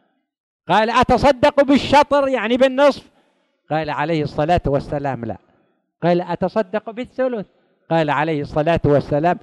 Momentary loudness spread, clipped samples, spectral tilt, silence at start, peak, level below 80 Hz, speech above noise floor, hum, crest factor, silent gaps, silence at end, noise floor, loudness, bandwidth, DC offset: 11 LU; under 0.1%; -6.5 dB/octave; 0.7 s; -4 dBFS; -40 dBFS; 45 dB; none; 14 dB; none; 0.05 s; -62 dBFS; -18 LUFS; 11.5 kHz; under 0.1%